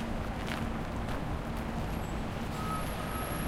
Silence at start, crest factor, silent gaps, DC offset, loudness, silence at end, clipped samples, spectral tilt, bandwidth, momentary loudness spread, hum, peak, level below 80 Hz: 0 s; 18 dB; none; under 0.1%; -36 LUFS; 0 s; under 0.1%; -5.5 dB/octave; 16.5 kHz; 2 LU; none; -16 dBFS; -40 dBFS